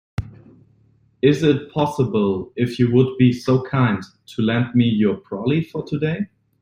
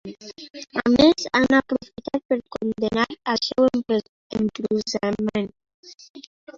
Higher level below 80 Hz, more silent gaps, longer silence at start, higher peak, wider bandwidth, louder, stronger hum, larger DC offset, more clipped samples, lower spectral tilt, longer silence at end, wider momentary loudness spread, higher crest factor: about the same, -50 dBFS vs -52 dBFS; second, none vs 2.25-2.29 s, 4.09-4.30 s, 5.74-5.83 s, 6.10-6.14 s, 6.27-6.47 s; first, 0.2 s vs 0.05 s; about the same, -2 dBFS vs -2 dBFS; first, 11 kHz vs 7.6 kHz; about the same, -20 LUFS vs -22 LUFS; neither; neither; neither; first, -8 dB/octave vs -4.5 dB/octave; first, 0.35 s vs 0.05 s; second, 10 LU vs 19 LU; about the same, 18 dB vs 20 dB